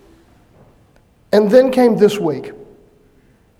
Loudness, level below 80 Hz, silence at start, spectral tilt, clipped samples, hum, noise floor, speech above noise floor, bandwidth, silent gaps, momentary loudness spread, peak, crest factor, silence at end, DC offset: -13 LUFS; -54 dBFS; 1.3 s; -6.5 dB/octave; under 0.1%; none; -52 dBFS; 40 dB; 15 kHz; none; 14 LU; 0 dBFS; 18 dB; 0.95 s; under 0.1%